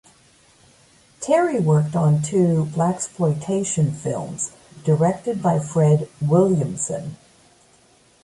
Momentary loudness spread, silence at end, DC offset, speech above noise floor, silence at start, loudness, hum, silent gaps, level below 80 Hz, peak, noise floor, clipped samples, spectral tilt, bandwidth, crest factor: 10 LU; 1.1 s; under 0.1%; 36 dB; 1.2 s; -20 LUFS; none; none; -58 dBFS; -4 dBFS; -55 dBFS; under 0.1%; -7 dB/octave; 11.5 kHz; 16 dB